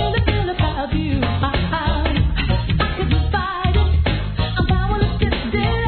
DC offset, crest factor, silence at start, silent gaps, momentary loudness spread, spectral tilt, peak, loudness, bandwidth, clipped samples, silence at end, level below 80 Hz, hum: under 0.1%; 14 dB; 0 s; none; 3 LU; -10 dB/octave; -4 dBFS; -20 LUFS; 4.5 kHz; under 0.1%; 0 s; -22 dBFS; none